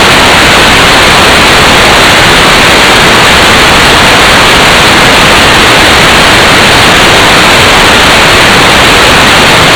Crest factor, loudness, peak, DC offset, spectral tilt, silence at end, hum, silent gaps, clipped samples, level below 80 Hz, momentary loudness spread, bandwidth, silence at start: 2 dB; -1 LUFS; 0 dBFS; under 0.1%; -2.5 dB/octave; 0 s; none; none; 40%; -20 dBFS; 0 LU; over 20 kHz; 0 s